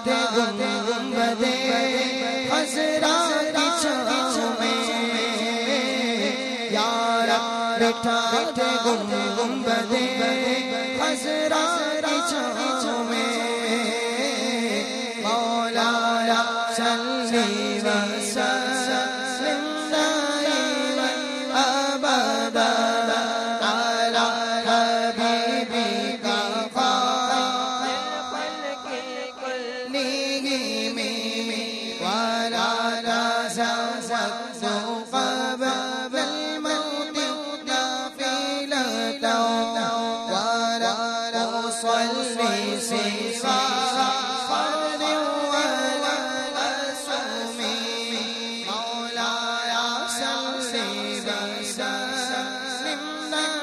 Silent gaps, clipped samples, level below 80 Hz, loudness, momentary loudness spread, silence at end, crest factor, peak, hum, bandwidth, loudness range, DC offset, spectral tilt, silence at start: none; under 0.1%; -68 dBFS; -24 LUFS; 6 LU; 0 s; 14 dB; -10 dBFS; none; 13 kHz; 4 LU; under 0.1%; -2 dB/octave; 0 s